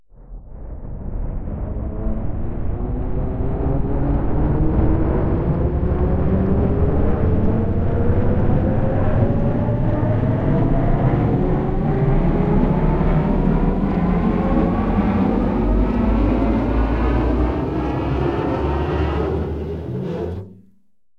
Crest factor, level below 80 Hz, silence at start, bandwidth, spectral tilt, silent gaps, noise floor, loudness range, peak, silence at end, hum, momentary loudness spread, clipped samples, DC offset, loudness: 14 dB; -22 dBFS; 0.2 s; 5.4 kHz; -10.5 dB/octave; none; -61 dBFS; 5 LU; -4 dBFS; 0.65 s; none; 9 LU; under 0.1%; under 0.1%; -20 LUFS